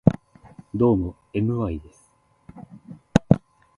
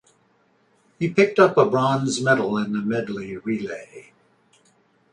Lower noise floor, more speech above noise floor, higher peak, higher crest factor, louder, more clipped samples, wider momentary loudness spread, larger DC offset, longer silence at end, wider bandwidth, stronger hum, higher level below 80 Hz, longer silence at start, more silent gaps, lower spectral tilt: about the same, -61 dBFS vs -62 dBFS; about the same, 38 dB vs 41 dB; about the same, 0 dBFS vs -2 dBFS; about the same, 24 dB vs 22 dB; about the same, -23 LUFS vs -21 LUFS; neither; first, 24 LU vs 14 LU; neither; second, 0.4 s vs 1.1 s; about the same, 11 kHz vs 10.5 kHz; neither; first, -44 dBFS vs -64 dBFS; second, 0.05 s vs 1 s; neither; first, -8.5 dB/octave vs -5.5 dB/octave